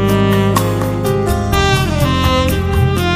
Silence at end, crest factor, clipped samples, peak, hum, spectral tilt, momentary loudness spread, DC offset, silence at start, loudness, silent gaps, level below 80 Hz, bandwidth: 0 s; 14 dB; under 0.1%; 0 dBFS; none; -6 dB/octave; 3 LU; under 0.1%; 0 s; -14 LUFS; none; -24 dBFS; 15.5 kHz